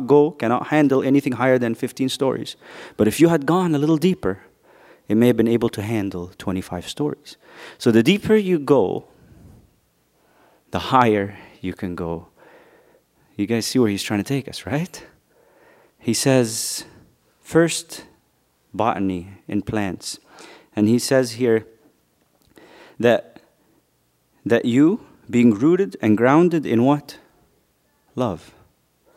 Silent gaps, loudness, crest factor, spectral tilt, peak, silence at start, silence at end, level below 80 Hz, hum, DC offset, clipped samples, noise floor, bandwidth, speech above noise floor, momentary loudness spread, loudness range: none; -20 LUFS; 22 dB; -5.5 dB/octave; 0 dBFS; 0 s; 0.75 s; -56 dBFS; none; under 0.1%; under 0.1%; -65 dBFS; 16 kHz; 46 dB; 16 LU; 6 LU